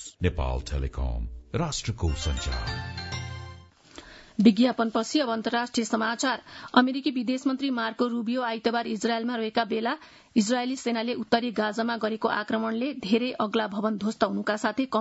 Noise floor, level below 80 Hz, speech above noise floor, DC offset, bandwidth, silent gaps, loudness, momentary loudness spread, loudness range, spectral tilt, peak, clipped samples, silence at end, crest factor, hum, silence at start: -49 dBFS; -40 dBFS; 22 dB; under 0.1%; 8 kHz; none; -27 LUFS; 10 LU; 5 LU; -5 dB/octave; -4 dBFS; under 0.1%; 0 s; 22 dB; none; 0 s